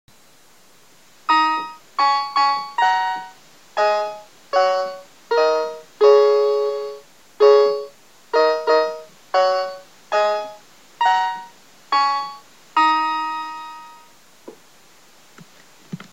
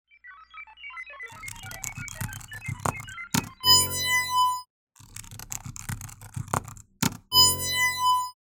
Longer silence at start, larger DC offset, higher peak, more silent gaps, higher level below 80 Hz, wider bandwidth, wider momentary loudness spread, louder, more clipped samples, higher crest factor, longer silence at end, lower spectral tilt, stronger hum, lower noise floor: first, 1.3 s vs 0.25 s; first, 0.3% vs under 0.1%; first, -2 dBFS vs -6 dBFS; second, none vs 4.70-4.87 s; second, -72 dBFS vs -52 dBFS; second, 15 kHz vs over 20 kHz; second, 20 LU vs 23 LU; first, -19 LUFS vs -23 LUFS; neither; about the same, 20 dB vs 22 dB; about the same, 0.15 s vs 0.25 s; first, -3 dB/octave vs -1.5 dB/octave; second, none vs 60 Hz at -65 dBFS; about the same, -53 dBFS vs -50 dBFS